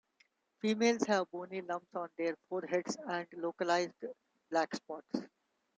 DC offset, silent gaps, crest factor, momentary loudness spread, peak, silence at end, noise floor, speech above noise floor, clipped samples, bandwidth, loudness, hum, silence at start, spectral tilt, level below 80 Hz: under 0.1%; none; 20 dB; 11 LU; -18 dBFS; 0.5 s; -74 dBFS; 38 dB; under 0.1%; 9.4 kHz; -36 LUFS; none; 0.65 s; -4 dB/octave; -84 dBFS